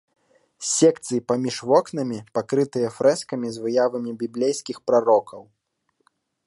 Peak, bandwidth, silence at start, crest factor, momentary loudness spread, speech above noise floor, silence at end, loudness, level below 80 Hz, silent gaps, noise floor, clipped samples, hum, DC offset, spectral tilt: -4 dBFS; 11.5 kHz; 0.6 s; 18 dB; 10 LU; 51 dB; 1.05 s; -22 LUFS; -70 dBFS; none; -72 dBFS; under 0.1%; none; under 0.1%; -4.5 dB/octave